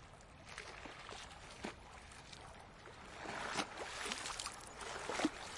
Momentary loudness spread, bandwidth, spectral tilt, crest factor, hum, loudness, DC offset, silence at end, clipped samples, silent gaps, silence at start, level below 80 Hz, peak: 14 LU; 11.5 kHz; -2.5 dB/octave; 24 dB; none; -46 LUFS; under 0.1%; 0 s; under 0.1%; none; 0 s; -64 dBFS; -22 dBFS